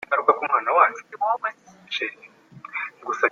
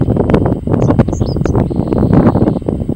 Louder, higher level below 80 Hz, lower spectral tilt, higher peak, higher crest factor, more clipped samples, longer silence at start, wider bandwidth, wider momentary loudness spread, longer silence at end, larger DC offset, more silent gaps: second, -23 LUFS vs -13 LUFS; second, -78 dBFS vs -24 dBFS; second, -3 dB/octave vs -9 dB/octave; about the same, -2 dBFS vs 0 dBFS; first, 22 dB vs 12 dB; neither; about the same, 0.1 s vs 0 s; second, 7.4 kHz vs 9.2 kHz; first, 12 LU vs 5 LU; about the same, 0 s vs 0 s; neither; neither